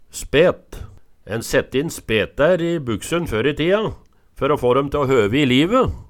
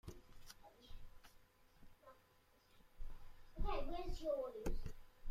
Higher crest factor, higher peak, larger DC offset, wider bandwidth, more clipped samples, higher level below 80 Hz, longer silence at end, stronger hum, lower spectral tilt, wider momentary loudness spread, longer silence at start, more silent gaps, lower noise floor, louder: about the same, 16 dB vs 18 dB; first, -2 dBFS vs -28 dBFS; neither; first, 18.5 kHz vs 14.5 kHz; neither; first, -38 dBFS vs -50 dBFS; about the same, 0.05 s vs 0 s; neither; about the same, -5.5 dB/octave vs -6 dB/octave; second, 11 LU vs 22 LU; about the same, 0.15 s vs 0.05 s; neither; second, -39 dBFS vs -72 dBFS; first, -19 LUFS vs -47 LUFS